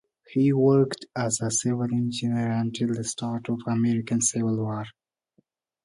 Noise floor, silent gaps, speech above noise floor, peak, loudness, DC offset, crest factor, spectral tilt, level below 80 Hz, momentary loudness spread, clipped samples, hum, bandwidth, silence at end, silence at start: -69 dBFS; none; 44 dB; -10 dBFS; -25 LUFS; under 0.1%; 16 dB; -5.5 dB/octave; -64 dBFS; 9 LU; under 0.1%; none; 11.5 kHz; 0.95 s; 0.3 s